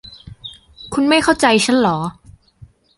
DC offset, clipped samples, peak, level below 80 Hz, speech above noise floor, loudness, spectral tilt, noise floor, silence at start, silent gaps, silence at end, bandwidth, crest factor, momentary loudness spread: under 0.1%; under 0.1%; -2 dBFS; -48 dBFS; 31 dB; -15 LUFS; -4 dB/octave; -46 dBFS; 0.05 s; none; 0.85 s; 11.5 kHz; 16 dB; 22 LU